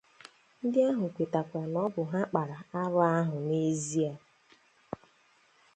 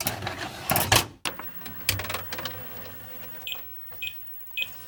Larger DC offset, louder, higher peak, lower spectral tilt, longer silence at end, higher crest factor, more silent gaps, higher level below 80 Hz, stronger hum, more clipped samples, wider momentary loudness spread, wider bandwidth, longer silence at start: neither; about the same, -31 LUFS vs -29 LUFS; second, -12 dBFS vs -2 dBFS; first, -6.5 dB/octave vs -2.5 dB/octave; first, 0.8 s vs 0 s; second, 20 dB vs 28 dB; neither; second, -74 dBFS vs -50 dBFS; neither; neither; about the same, 16 LU vs 14 LU; second, 9.2 kHz vs 19 kHz; first, 0.65 s vs 0 s